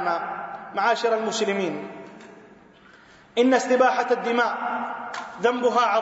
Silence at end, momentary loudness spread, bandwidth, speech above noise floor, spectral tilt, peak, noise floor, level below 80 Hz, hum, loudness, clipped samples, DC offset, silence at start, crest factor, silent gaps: 0 s; 14 LU; 8 kHz; 28 dB; -3.5 dB/octave; -6 dBFS; -51 dBFS; -72 dBFS; none; -23 LUFS; under 0.1%; under 0.1%; 0 s; 18 dB; none